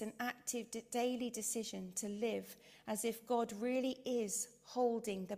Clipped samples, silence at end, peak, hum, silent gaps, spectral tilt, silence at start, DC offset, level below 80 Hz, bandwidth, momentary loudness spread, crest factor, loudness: under 0.1%; 0 s; -24 dBFS; none; none; -3.5 dB/octave; 0 s; under 0.1%; -80 dBFS; 16 kHz; 6 LU; 16 dB; -40 LUFS